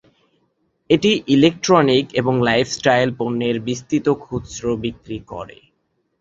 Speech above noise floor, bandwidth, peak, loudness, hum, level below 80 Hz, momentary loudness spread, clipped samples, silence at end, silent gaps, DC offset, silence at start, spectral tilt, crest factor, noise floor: 51 dB; 7.8 kHz; -2 dBFS; -18 LUFS; none; -50 dBFS; 16 LU; under 0.1%; 0.75 s; none; under 0.1%; 0.9 s; -5 dB/octave; 18 dB; -69 dBFS